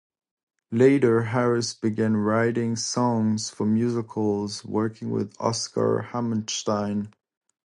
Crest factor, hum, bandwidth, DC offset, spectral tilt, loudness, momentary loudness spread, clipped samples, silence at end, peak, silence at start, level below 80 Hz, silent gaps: 18 dB; none; 11 kHz; under 0.1%; -5.5 dB/octave; -24 LUFS; 8 LU; under 0.1%; 0.55 s; -6 dBFS; 0.7 s; -62 dBFS; none